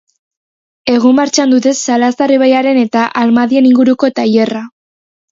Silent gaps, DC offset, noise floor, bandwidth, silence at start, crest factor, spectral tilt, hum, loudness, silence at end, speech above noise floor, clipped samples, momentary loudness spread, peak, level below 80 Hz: none; under 0.1%; under -90 dBFS; 7.8 kHz; 0.85 s; 12 dB; -4 dB/octave; none; -10 LUFS; 0.65 s; over 80 dB; under 0.1%; 6 LU; 0 dBFS; -58 dBFS